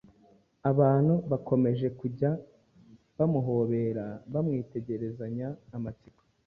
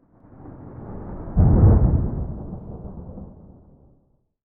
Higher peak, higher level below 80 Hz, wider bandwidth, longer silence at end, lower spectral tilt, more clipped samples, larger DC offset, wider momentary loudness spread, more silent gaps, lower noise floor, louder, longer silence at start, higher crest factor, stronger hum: second, -10 dBFS vs -4 dBFS; second, -62 dBFS vs -26 dBFS; first, 4.4 kHz vs 2.1 kHz; second, 0.5 s vs 1.2 s; second, -12 dB/octave vs -15.5 dB/octave; neither; neither; second, 13 LU vs 26 LU; neither; about the same, -62 dBFS vs -62 dBFS; second, -29 LUFS vs -19 LUFS; first, 0.65 s vs 0.45 s; about the same, 18 dB vs 18 dB; neither